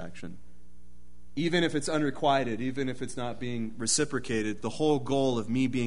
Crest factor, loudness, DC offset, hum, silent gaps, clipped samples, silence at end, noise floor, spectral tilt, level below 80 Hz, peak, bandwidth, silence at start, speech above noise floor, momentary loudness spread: 18 dB; -29 LUFS; 1%; none; none; under 0.1%; 0 s; -57 dBFS; -4.5 dB/octave; -56 dBFS; -12 dBFS; 11 kHz; 0 s; 27 dB; 9 LU